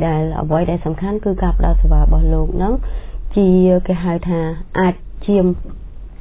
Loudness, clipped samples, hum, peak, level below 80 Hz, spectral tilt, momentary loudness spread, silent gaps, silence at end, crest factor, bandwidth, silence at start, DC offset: -17 LUFS; under 0.1%; none; -2 dBFS; -18 dBFS; -12.5 dB/octave; 12 LU; none; 0.05 s; 14 dB; 3.9 kHz; 0 s; under 0.1%